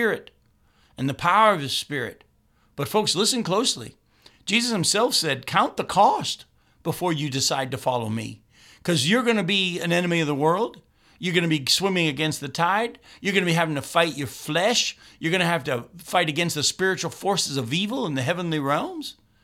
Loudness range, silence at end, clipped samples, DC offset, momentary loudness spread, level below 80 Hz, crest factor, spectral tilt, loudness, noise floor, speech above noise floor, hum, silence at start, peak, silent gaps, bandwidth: 2 LU; 0.3 s; under 0.1%; under 0.1%; 11 LU; -62 dBFS; 20 dB; -3.5 dB/octave; -23 LUFS; -61 dBFS; 37 dB; none; 0 s; -4 dBFS; none; 16.5 kHz